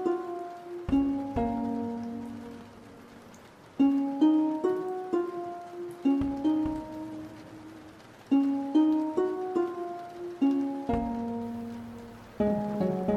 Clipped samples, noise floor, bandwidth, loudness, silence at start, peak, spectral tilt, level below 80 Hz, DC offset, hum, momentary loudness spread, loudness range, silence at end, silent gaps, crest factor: under 0.1%; -51 dBFS; 9.4 kHz; -30 LUFS; 0 s; -14 dBFS; -8 dB/octave; -52 dBFS; under 0.1%; none; 21 LU; 4 LU; 0 s; none; 16 dB